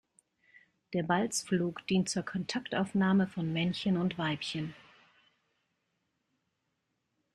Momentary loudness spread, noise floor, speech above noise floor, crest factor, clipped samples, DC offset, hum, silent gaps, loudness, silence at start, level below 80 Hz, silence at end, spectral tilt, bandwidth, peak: 8 LU; -82 dBFS; 50 dB; 20 dB; under 0.1%; under 0.1%; none; none; -32 LUFS; 0.9 s; -68 dBFS; 2.6 s; -5 dB/octave; 12.5 kHz; -14 dBFS